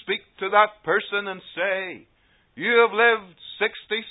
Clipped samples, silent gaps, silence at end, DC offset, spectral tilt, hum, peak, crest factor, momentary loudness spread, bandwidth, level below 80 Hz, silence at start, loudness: under 0.1%; none; 0 s; under 0.1%; -8 dB/octave; none; -4 dBFS; 20 dB; 13 LU; 4 kHz; -70 dBFS; 0.05 s; -22 LUFS